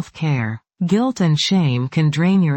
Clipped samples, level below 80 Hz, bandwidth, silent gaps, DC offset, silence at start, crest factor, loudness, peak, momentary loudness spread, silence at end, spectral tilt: under 0.1%; -56 dBFS; 8.6 kHz; none; under 0.1%; 0 s; 12 dB; -18 LUFS; -6 dBFS; 6 LU; 0 s; -6.5 dB/octave